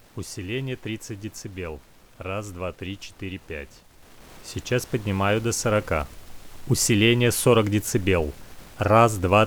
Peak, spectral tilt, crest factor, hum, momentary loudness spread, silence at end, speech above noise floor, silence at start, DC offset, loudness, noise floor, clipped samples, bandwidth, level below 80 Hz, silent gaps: -4 dBFS; -4.5 dB/octave; 22 dB; none; 19 LU; 0 s; 24 dB; 0.15 s; under 0.1%; -23 LUFS; -47 dBFS; under 0.1%; over 20 kHz; -44 dBFS; none